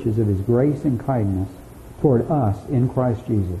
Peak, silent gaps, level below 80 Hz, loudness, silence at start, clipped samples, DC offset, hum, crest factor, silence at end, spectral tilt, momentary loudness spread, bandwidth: -6 dBFS; none; -42 dBFS; -21 LUFS; 0 s; under 0.1%; under 0.1%; none; 14 dB; 0 s; -10.5 dB/octave; 5 LU; 13 kHz